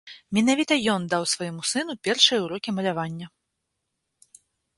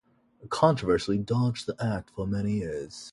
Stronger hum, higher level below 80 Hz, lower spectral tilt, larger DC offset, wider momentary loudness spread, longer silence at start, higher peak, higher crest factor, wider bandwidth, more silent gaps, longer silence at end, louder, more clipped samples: neither; second, -66 dBFS vs -52 dBFS; second, -3 dB/octave vs -6.5 dB/octave; neither; about the same, 12 LU vs 10 LU; second, 0.05 s vs 0.4 s; about the same, -4 dBFS vs -6 dBFS; about the same, 22 dB vs 22 dB; about the same, 11.5 kHz vs 11.5 kHz; neither; first, 1.5 s vs 0 s; first, -23 LUFS vs -28 LUFS; neither